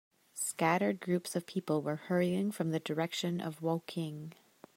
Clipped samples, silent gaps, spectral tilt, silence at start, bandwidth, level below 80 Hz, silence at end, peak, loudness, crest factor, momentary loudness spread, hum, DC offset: under 0.1%; none; -5 dB/octave; 0.35 s; 16 kHz; -80 dBFS; 0.45 s; -14 dBFS; -34 LUFS; 20 dB; 9 LU; none; under 0.1%